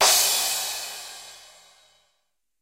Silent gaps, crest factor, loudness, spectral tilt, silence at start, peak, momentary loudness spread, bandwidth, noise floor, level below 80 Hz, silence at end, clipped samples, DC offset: none; 22 dB; -21 LUFS; 2.5 dB/octave; 0 s; -6 dBFS; 23 LU; 16 kHz; -76 dBFS; -68 dBFS; 1.2 s; under 0.1%; under 0.1%